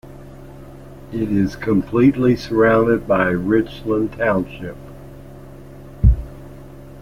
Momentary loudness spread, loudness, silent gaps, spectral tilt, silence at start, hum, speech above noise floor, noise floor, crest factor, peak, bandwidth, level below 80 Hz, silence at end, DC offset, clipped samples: 25 LU; -18 LUFS; none; -8.5 dB/octave; 0.05 s; none; 20 dB; -38 dBFS; 18 dB; -2 dBFS; 15.5 kHz; -28 dBFS; 0 s; under 0.1%; under 0.1%